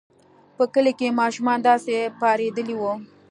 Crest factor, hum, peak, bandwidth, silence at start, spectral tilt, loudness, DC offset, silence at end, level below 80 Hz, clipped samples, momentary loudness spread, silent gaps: 18 dB; none; -4 dBFS; 11 kHz; 0.6 s; -4.5 dB/octave; -22 LUFS; under 0.1%; 0.25 s; -76 dBFS; under 0.1%; 7 LU; none